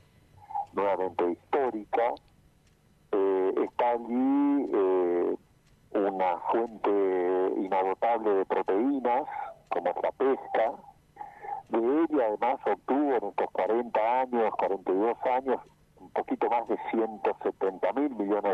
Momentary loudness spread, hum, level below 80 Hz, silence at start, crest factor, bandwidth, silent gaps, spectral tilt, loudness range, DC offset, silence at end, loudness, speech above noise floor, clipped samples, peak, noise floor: 8 LU; none; -68 dBFS; 0.4 s; 12 dB; 5.2 kHz; none; -7.5 dB/octave; 2 LU; under 0.1%; 0 s; -28 LUFS; 35 dB; under 0.1%; -16 dBFS; -63 dBFS